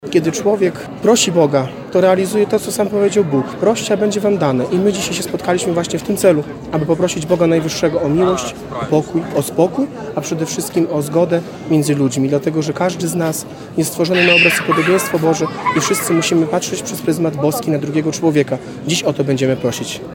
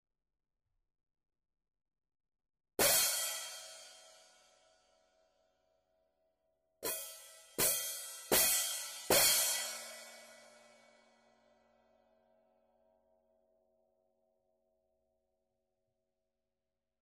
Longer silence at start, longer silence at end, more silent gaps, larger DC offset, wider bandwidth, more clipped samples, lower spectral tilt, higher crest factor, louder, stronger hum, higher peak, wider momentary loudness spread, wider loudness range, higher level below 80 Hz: second, 0 s vs 2.8 s; second, 0 s vs 6.65 s; neither; neither; about the same, 17 kHz vs 15.5 kHz; neither; first, -4.5 dB/octave vs 0 dB/octave; second, 16 dB vs 26 dB; first, -16 LUFS vs -31 LUFS; neither; first, 0 dBFS vs -16 dBFS; second, 7 LU vs 21 LU; second, 3 LU vs 16 LU; first, -50 dBFS vs -70 dBFS